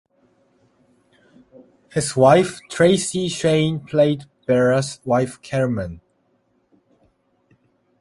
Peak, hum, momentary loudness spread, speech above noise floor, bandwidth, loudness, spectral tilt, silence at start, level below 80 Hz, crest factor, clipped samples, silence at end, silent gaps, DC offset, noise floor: -2 dBFS; none; 11 LU; 46 dB; 11.5 kHz; -19 LUFS; -5.5 dB/octave; 1.95 s; -52 dBFS; 20 dB; under 0.1%; 2.05 s; none; under 0.1%; -65 dBFS